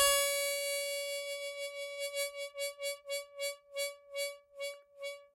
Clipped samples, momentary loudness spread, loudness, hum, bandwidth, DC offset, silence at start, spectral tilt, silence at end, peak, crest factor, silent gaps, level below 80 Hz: under 0.1%; 11 LU; -37 LUFS; none; 16 kHz; under 0.1%; 0 s; 3 dB/octave; 0.1 s; -16 dBFS; 22 dB; none; -72 dBFS